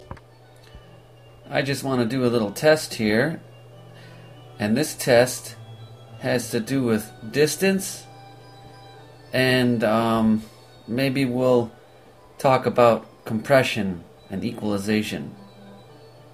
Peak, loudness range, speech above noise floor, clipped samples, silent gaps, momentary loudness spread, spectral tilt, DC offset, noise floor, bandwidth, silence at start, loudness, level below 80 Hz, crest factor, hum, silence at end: -4 dBFS; 4 LU; 28 dB; under 0.1%; none; 16 LU; -5 dB/octave; under 0.1%; -50 dBFS; 15.5 kHz; 0 s; -22 LUFS; -56 dBFS; 20 dB; none; 0.55 s